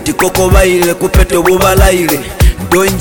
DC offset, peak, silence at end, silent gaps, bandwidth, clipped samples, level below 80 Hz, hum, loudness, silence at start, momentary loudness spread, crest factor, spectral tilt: 1%; 0 dBFS; 0 s; none; 17.5 kHz; 0.3%; -14 dBFS; none; -9 LUFS; 0 s; 4 LU; 8 dB; -5 dB/octave